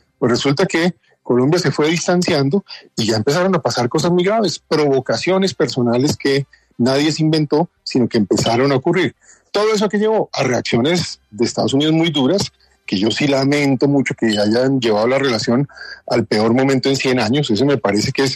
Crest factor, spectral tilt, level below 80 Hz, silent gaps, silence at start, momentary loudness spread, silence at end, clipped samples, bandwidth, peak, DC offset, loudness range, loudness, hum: 14 dB; -5 dB/octave; -54 dBFS; none; 0.2 s; 5 LU; 0 s; under 0.1%; 13.5 kHz; -2 dBFS; under 0.1%; 1 LU; -16 LUFS; none